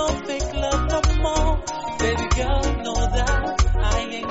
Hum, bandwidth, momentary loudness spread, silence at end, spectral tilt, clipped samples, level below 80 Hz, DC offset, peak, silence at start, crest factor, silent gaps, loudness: none; 8 kHz; 4 LU; 0 s; -4.5 dB/octave; under 0.1%; -24 dBFS; 0.4%; -6 dBFS; 0 s; 14 dB; none; -23 LUFS